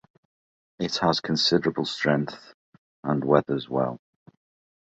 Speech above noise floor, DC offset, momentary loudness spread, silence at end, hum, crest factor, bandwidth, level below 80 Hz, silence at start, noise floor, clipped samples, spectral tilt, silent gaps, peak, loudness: over 66 dB; under 0.1%; 13 LU; 0.9 s; none; 22 dB; 8.2 kHz; -60 dBFS; 0.8 s; under -90 dBFS; under 0.1%; -5.5 dB/octave; 2.54-3.03 s; -4 dBFS; -25 LUFS